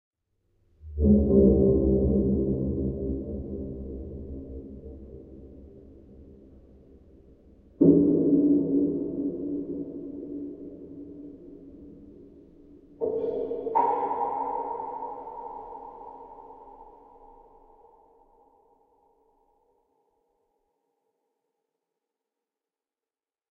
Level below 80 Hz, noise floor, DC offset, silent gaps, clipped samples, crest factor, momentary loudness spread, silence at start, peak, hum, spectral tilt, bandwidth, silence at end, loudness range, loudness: -40 dBFS; under -90 dBFS; under 0.1%; none; under 0.1%; 22 dB; 26 LU; 0.85 s; -8 dBFS; none; -12.5 dB/octave; 2.7 kHz; 6.6 s; 20 LU; -26 LUFS